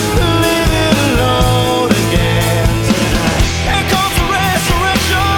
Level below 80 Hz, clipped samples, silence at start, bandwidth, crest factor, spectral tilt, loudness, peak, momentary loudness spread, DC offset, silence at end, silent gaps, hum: -22 dBFS; under 0.1%; 0 s; 19.5 kHz; 12 dB; -4.5 dB/octave; -13 LUFS; 0 dBFS; 2 LU; under 0.1%; 0 s; none; none